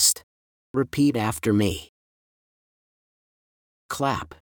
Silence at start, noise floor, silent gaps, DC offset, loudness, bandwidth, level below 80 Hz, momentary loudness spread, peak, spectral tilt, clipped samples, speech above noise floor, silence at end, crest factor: 0 s; under -90 dBFS; 0.23-0.74 s, 1.89-3.89 s; under 0.1%; -24 LUFS; over 20 kHz; -54 dBFS; 9 LU; -6 dBFS; -4 dB/octave; under 0.1%; over 66 dB; 0.1 s; 22 dB